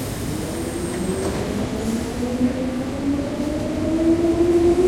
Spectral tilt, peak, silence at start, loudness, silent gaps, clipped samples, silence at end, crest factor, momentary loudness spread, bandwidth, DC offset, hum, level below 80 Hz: -6 dB/octave; -8 dBFS; 0 s; -22 LUFS; none; under 0.1%; 0 s; 14 dB; 8 LU; 16.5 kHz; under 0.1%; none; -36 dBFS